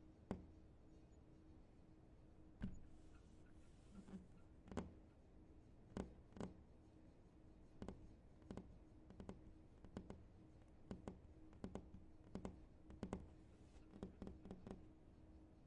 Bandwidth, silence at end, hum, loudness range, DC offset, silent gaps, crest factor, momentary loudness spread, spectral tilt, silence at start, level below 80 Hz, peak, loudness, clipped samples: 10 kHz; 0 s; none; 4 LU; under 0.1%; none; 28 dB; 13 LU; -7.5 dB/octave; 0 s; -66 dBFS; -30 dBFS; -60 LUFS; under 0.1%